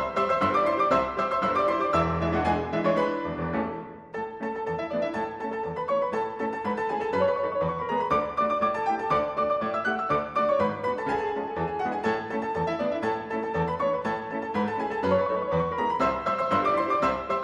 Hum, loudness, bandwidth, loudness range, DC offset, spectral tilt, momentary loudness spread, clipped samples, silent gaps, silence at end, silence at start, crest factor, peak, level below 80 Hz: none; -27 LUFS; 10.5 kHz; 4 LU; under 0.1%; -7 dB/octave; 7 LU; under 0.1%; none; 0 s; 0 s; 16 dB; -10 dBFS; -52 dBFS